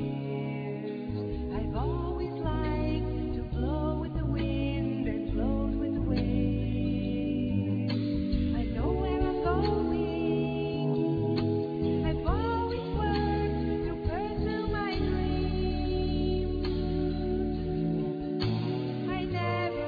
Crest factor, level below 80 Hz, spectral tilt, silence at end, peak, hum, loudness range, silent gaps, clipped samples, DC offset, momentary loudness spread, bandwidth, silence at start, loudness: 16 dB; -36 dBFS; -10 dB/octave; 0 s; -14 dBFS; none; 2 LU; none; under 0.1%; under 0.1%; 4 LU; 5 kHz; 0 s; -31 LUFS